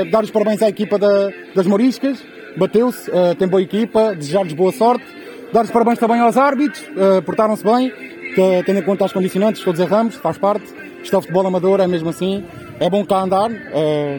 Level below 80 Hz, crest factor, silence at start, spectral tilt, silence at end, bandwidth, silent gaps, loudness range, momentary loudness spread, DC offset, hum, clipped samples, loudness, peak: -58 dBFS; 14 dB; 0 s; -6.5 dB/octave; 0 s; 19 kHz; none; 2 LU; 7 LU; under 0.1%; none; under 0.1%; -16 LUFS; -2 dBFS